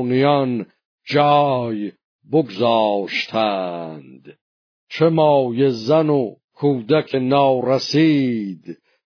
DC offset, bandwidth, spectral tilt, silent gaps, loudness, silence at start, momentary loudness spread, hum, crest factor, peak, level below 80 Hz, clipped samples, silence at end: under 0.1%; 5.4 kHz; -7 dB/octave; 0.85-0.98 s, 2.04-2.19 s, 4.41-4.87 s, 6.44-6.48 s; -18 LUFS; 0 s; 15 LU; none; 16 dB; -2 dBFS; -66 dBFS; under 0.1%; 0.3 s